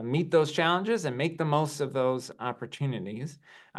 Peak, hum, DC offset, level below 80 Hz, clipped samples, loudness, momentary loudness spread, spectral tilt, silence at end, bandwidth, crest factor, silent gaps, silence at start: -10 dBFS; none; under 0.1%; -76 dBFS; under 0.1%; -29 LUFS; 11 LU; -5.5 dB/octave; 0 s; 12.5 kHz; 18 dB; none; 0 s